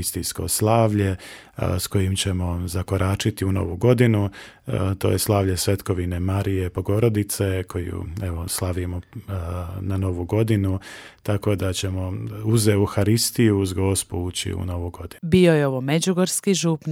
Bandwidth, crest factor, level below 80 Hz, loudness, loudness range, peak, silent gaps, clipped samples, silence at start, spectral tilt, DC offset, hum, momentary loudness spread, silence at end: 16.5 kHz; 18 dB; -44 dBFS; -22 LUFS; 5 LU; -2 dBFS; none; under 0.1%; 0 s; -5.5 dB/octave; under 0.1%; none; 11 LU; 0 s